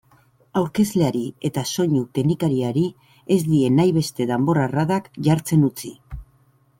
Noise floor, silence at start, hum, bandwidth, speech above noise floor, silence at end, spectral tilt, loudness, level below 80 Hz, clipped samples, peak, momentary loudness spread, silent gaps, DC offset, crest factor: -58 dBFS; 0.55 s; none; 16.5 kHz; 39 dB; 0.55 s; -6.5 dB/octave; -21 LUFS; -48 dBFS; under 0.1%; -6 dBFS; 9 LU; none; under 0.1%; 16 dB